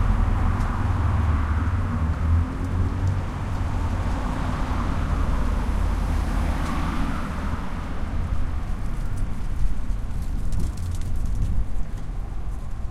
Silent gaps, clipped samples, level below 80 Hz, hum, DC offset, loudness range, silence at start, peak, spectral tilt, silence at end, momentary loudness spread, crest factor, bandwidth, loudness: none; under 0.1%; -26 dBFS; none; under 0.1%; 6 LU; 0 s; -8 dBFS; -7 dB/octave; 0 s; 8 LU; 14 dB; 12.5 kHz; -27 LUFS